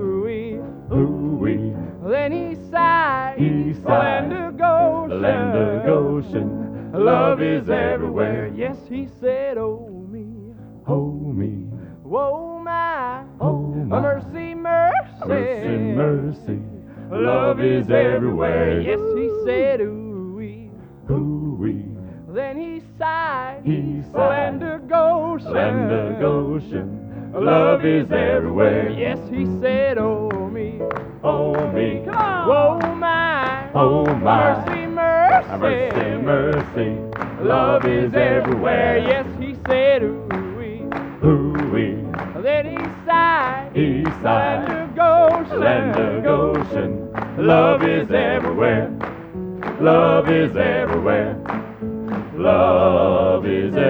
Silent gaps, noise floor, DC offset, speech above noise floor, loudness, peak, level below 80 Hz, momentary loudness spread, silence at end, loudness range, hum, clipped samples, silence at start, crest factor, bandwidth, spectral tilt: none; -39 dBFS; under 0.1%; 21 dB; -19 LUFS; 0 dBFS; -44 dBFS; 12 LU; 0 s; 7 LU; none; under 0.1%; 0 s; 18 dB; over 20 kHz; -9 dB/octave